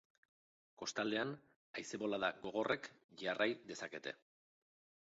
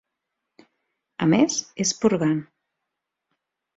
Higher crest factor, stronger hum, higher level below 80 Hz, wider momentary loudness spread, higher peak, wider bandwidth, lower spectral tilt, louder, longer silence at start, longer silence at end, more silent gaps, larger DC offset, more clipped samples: about the same, 22 dB vs 20 dB; neither; second, -84 dBFS vs -64 dBFS; first, 12 LU vs 8 LU; second, -22 dBFS vs -6 dBFS; about the same, 7.6 kHz vs 7.8 kHz; second, -2 dB/octave vs -4.5 dB/octave; second, -42 LUFS vs -22 LUFS; second, 0.8 s vs 1.2 s; second, 0.85 s vs 1.35 s; first, 1.56-1.74 s, 3.04-3.09 s vs none; neither; neither